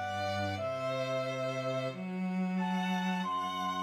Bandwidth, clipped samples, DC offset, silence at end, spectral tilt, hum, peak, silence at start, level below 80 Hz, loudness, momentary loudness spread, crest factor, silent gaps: 13 kHz; under 0.1%; under 0.1%; 0 s; -6 dB/octave; none; -22 dBFS; 0 s; -76 dBFS; -34 LUFS; 3 LU; 12 dB; none